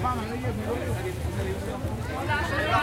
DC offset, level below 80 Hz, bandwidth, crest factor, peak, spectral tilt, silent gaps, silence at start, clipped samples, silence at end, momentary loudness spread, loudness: under 0.1%; -38 dBFS; 16 kHz; 18 dB; -10 dBFS; -6 dB/octave; none; 0 s; under 0.1%; 0 s; 6 LU; -29 LUFS